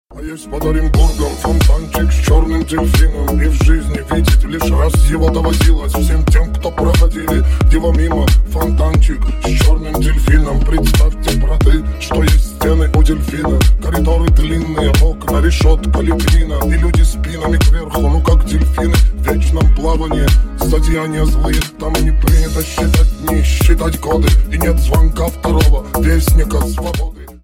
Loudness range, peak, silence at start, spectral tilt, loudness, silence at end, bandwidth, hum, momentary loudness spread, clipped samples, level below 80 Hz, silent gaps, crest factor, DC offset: 1 LU; 0 dBFS; 0.1 s; -6 dB/octave; -14 LUFS; 0.1 s; 17 kHz; none; 4 LU; under 0.1%; -12 dBFS; none; 12 dB; under 0.1%